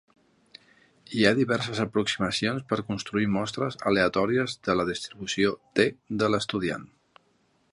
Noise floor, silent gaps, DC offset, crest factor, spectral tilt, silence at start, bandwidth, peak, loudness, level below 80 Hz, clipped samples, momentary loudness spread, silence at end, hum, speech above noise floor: -68 dBFS; none; under 0.1%; 24 dB; -5 dB/octave; 1.1 s; 11.5 kHz; -4 dBFS; -26 LUFS; -58 dBFS; under 0.1%; 7 LU; 0.85 s; none; 41 dB